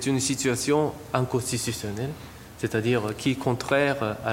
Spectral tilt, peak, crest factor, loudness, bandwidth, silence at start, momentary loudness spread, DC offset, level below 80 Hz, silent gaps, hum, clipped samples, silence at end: -4.5 dB/octave; -6 dBFS; 20 dB; -26 LUFS; 16.5 kHz; 0 s; 10 LU; under 0.1%; -54 dBFS; none; none; under 0.1%; 0 s